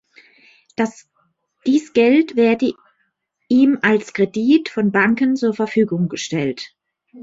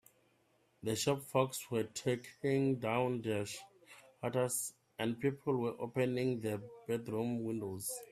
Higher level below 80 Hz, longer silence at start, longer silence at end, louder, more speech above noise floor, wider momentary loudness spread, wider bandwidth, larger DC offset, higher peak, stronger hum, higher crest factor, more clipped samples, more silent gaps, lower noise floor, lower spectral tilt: first, -62 dBFS vs -74 dBFS; about the same, 0.8 s vs 0.8 s; about the same, 0 s vs 0.05 s; first, -17 LUFS vs -37 LUFS; first, 52 dB vs 37 dB; about the same, 9 LU vs 7 LU; second, 7.8 kHz vs 15.5 kHz; neither; first, -4 dBFS vs -16 dBFS; neither; second, 16 dB vs 22 dB; neither; neither; second, -69 dBFS vs -73 dBFS; about the same, -6 dB/octave vs -5 dB/octave